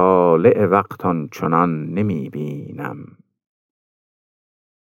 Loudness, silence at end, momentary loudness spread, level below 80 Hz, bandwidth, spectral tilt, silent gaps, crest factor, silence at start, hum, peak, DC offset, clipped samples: -18 LUFS; 1.95 s; 16 LU; -64 dBFS; 16 kHz; -9 dB/octave; none; 18 dB; 0 s; none; -2 dBFS; under 0.1%; under 0.1%